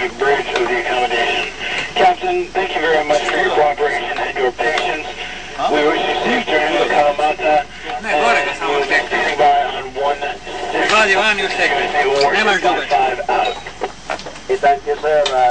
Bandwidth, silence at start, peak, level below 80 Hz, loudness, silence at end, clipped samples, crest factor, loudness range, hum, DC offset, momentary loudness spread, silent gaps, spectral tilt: 9.4 kHz; 0 s; -2 dBFS; -46 dBFS; -16 LUFS; 0 s; under 0.1%; 14 dB; 2 LU; none; 1%; 9 LU; none; -3 dB/octave